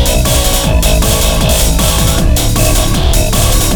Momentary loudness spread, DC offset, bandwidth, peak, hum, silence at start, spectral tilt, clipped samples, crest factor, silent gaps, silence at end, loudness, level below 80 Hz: 1 LU; under 0.1%; over 20 kHz; 0 dBFS; none; 0 s; -3.5 dB/octave; under 0.1%; 10 dB; none; 0 s; -11 LUFS; -12 dBFS